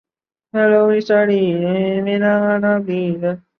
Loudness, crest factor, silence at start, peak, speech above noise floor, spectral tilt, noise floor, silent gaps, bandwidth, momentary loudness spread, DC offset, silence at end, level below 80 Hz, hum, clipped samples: -16 LUFS; 14 dB; 0.55 s; -4 dBFS; 38 dB; -8.5 dB/octave; -54 dBFS; none; 6.2 kHz; 7 LU; under 0.1%; 0.2 s; -62 dBFS; none; under 0.1%